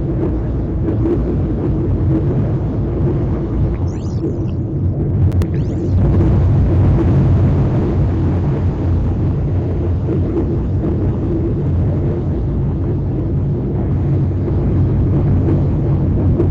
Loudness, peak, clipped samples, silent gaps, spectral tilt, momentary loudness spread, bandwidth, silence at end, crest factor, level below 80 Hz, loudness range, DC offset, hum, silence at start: -16 LUFS; -4 dBFS; under 0.1%; none; -11 dB/octave; 5 LU; 4.5 kHz; 0 s; 10 dB; -22 dBFS; 3 LU; under 0.1%; none; 0 s